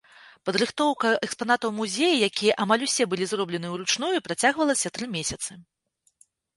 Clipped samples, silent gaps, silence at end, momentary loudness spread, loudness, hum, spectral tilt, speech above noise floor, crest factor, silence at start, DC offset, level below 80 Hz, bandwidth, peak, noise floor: under 0.1%; none; 0.95 s; 8 LU; -25 LUFS; none; -3 dB/octave; 38 dB; 20 dB; 0.25 s; under 0.1%; -62 dBFS; 12 kHz; -6 dBFS; -63 dBFS